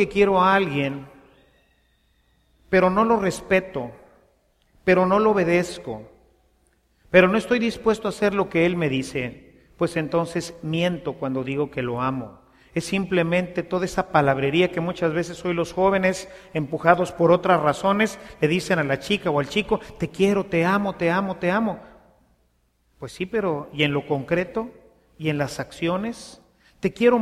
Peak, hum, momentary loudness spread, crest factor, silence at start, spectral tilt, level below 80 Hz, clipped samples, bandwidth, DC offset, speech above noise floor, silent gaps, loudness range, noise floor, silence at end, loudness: 0 dBFS; none; 12 LU; 22 dB; 0 s; -6 dB/octave; -52 dBFS; under 0.1%; 14.5 kHz; under 0.1%; 44 dB; none; 5 LU; -66 dBFS; 0 s; -22 LUFS